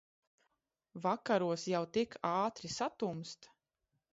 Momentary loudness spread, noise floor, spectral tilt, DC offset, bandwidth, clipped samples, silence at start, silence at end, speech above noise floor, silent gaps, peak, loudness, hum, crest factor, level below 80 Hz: 13 LU; -85 dBFS; -4.5 dB/octave; under 0.1%; 7.6 kHz; under 0.1%; 0.95 s; 0.65 s; 49 dB; none; -20 dBFS; -37 LUFS; none; 18 dB; -76 dBFS